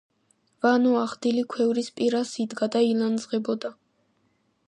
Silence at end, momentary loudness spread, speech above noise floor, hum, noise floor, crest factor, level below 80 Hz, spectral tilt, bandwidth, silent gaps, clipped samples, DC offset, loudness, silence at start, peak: 0.95 s; 8 LU; 45 dB; none; -69 dBFS; 18 dB; -76 dBFS; -5 dB/octave; 10 kHz; none; under 0.1%; under 0.1%; -25 LUFS; 0.65 s; -8 dBFS